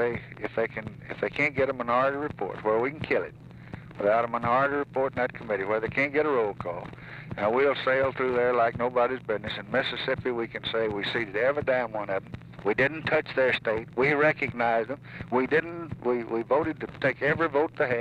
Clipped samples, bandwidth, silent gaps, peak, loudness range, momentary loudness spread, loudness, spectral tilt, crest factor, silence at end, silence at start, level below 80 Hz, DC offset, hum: under 0.1%; 8.8 kHz; none; -12 dBFS; 2 LU; 10 LU; -27 LUFS; -7 dB/octave; 16 dB; 0 s; 0 s; -58 dBFS; under 0.1%; none